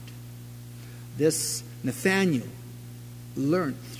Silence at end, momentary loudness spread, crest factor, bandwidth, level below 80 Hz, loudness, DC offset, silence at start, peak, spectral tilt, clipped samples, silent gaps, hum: 0 s; 19 LU; 20 dB; 16 kHz; -58 dBFS; -27 LUFS; under 0.1%; 0 s; -10 dBFS; -4.5 dB/octave; under 0.1%; none; 60 Hz at -40 dBFS